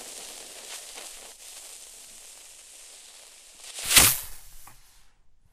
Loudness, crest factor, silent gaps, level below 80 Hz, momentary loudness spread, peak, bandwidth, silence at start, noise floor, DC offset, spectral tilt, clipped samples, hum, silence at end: -19 LUFS; 30 dB; none; -50 dBFS; 28 LU; 0 dBFS; 16 kHz; 0 s; -55 dBFS; under 0.1%; 0 dB/octave; under 0.1%; none; 0.8 s